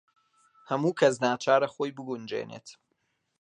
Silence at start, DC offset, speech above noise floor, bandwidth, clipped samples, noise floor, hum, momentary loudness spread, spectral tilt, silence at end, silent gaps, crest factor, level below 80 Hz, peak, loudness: 0.7 s; under 0.1%; 49 dB; 10.5 kHz; under 0.1%; -77 dBFS; none; 13 LU; -5 dB/octave; 0.7 s; none; 22 dB; -78 dBFS; -8 dBFS; -28 LUFS